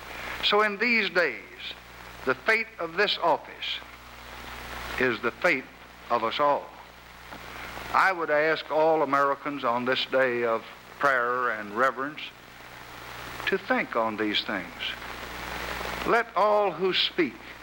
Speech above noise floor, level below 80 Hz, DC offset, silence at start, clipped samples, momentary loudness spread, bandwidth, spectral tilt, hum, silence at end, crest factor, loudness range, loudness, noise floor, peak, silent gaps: 21 dB; -54 dBFS; under 0.1%; 0 s; under 0.1%; 19 LU; 20 kHz; -4 dB/octave; 60 Hz at -55 dBFS; 0 s; 20 dB; 4 LU; -26 LUFS; -47 dBFS; -8 dBFS; none